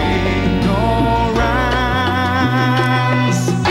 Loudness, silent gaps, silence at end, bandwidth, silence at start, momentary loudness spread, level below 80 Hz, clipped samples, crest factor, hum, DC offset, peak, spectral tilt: -15 LUFS; none; 0 s; 14 kHz; 0 s; 1 LU; -26 dBFS; under 0.1%; 10 dB; none; under 0.1%; -4 dBFS; -6 dB/octave